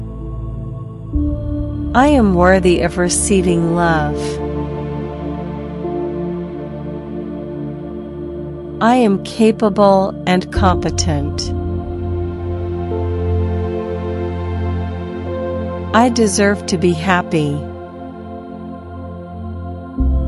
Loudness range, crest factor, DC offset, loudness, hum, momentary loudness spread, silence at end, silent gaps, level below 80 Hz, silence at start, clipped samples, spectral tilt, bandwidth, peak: 9 LU; 16 dB; under 0.1%; -17 LUFS; none; 16 LU; 0 s; none; -28 dBFS; 0 s; under 0.1%; -5.5 dB/octave; 12 kHz; 0 dBFS